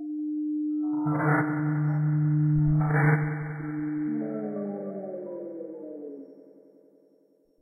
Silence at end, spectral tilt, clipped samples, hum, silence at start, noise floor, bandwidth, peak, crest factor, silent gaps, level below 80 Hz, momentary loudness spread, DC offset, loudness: 1.2 s; -12.5 dB/octave; under 0.1%; none; 0 s; -64 dBFS; 2.4 kHz; -12 dBFS; 16 dB; none; -54 dBFS; 16 LU; under 0.1%; -27 LUFS